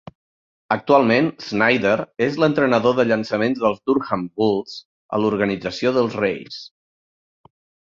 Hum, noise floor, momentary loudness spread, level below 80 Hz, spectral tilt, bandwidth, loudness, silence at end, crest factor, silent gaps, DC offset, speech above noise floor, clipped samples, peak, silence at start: none; under -90 dBFS; 9 LU; -58 dBFS; -6.5 dB/octave; 7.6 kHz; -19 LUFS; 1.15 s; 18 dB; 4.85-5.09 s; under 0.1%; over 71 dB; under 0.1%; -2 dBFS; 0.7 s